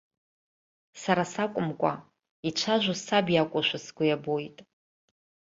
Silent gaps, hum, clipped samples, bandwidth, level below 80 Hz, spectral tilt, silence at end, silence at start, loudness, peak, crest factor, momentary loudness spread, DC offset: 2.31-2.43 s; none; under 0.1%; 8 kHz; -70 dBFS; -4.5 dB/octave; 0.95 s; 0.95 s; -28 LUFS; -8 dBFS; 22 dB; 10 LU; under 0.1%